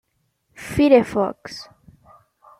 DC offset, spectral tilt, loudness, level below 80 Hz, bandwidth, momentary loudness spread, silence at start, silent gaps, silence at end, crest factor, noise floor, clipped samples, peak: under 0.1%; -6 dB/octave; -18 LUFS; -50 dBFS; 14.5 kHz; 22 LU; 0.6 s; none; 0.95 s; 20 dB; -68 dBFS; under 0.1%; -2 dBFS